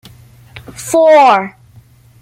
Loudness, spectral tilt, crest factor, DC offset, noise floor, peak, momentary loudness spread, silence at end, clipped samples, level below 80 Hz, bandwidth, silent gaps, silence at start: -9 LUFS; -4 dB/octave; 12 dB; under 0.1%; -43 dBFS; 0 dBFS; 21 LU; 0.7 s; under 0.1%; -52 dBFS; 15.5 kHz; none; 0.55 s